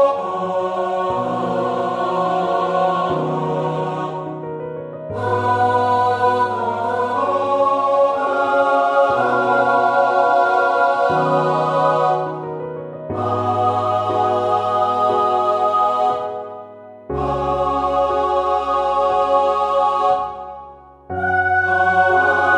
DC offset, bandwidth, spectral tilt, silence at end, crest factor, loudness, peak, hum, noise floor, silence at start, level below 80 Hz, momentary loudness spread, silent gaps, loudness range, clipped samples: under 0.1%; 10 kHz; -6.5 dB/octave; 0 s; 16 dB; -18 LUFS; -2 dBFS; none; -40 dBFS; 0 s; -48 dBFS; 12 LU; none; 4 LU; under 0.1%